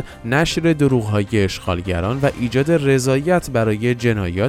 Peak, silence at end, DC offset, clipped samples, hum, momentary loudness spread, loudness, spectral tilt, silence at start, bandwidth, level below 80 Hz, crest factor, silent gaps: -2 dBFS; 0 s; under 0.1%; under 0.1%; none; 5 LU; -18 LUFS; -6 dB/octave; 0 s; 16 kHz; -38 dBFS; 14 dB; none